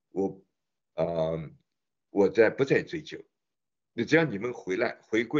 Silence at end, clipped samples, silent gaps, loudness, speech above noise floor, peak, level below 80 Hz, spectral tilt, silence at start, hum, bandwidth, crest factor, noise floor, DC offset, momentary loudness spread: 0 s; under 0.1%; none; -28 LUFS; over 63 dB; -8 dBFS; -64 dBFS; -6.5 dB/octave; 0.15 s; none; 7.6 kHz; 20 dB; under -90 dBFS; under 0.1%; 18 LU